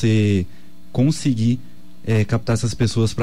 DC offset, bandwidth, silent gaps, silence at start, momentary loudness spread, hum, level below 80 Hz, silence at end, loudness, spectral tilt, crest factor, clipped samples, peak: 3%; 12 kHz; none; 0 s; 9 LU; none; -44 dBFS; 0 s; -20 LUFS; -6.5 dB/octave; 12 dB; under 0.1%; -8 dBFS